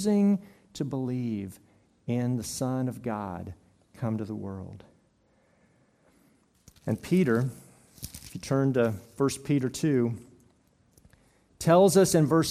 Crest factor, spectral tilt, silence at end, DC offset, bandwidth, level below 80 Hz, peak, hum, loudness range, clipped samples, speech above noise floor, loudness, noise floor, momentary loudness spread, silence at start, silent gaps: 20 dB; -6 dB/octave; 0 s; under 0.1%; 16 kHz; -62 dBFS; -8 dBFS; none; 12 LU; under 0.1%; 40 dB; -27 LUFS; -66 dBFS; 20 LU; 0 s; none